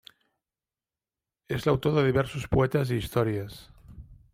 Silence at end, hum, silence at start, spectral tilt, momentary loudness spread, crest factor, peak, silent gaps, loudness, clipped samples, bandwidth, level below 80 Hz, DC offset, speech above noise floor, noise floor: 0.2 s; none; 1.5 s; -7 dB/octave; 11 LU; 20 dB; -10 dBFS; none; -27 LUFS; under 0.1%; 16 kHz; -48 dBFS; under 0.1%; over 64 dB; under -90 dBFS